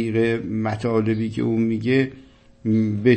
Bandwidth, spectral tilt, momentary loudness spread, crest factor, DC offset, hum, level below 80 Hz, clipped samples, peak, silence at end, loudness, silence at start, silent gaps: 8.8 kHz; -8.5 dB/octave; 5 LU; 16 dB; under 0.1%; none; -54 dBFS; under 0.1%; -4 dBFS; 0 s; -22 LUFS; 0 s; none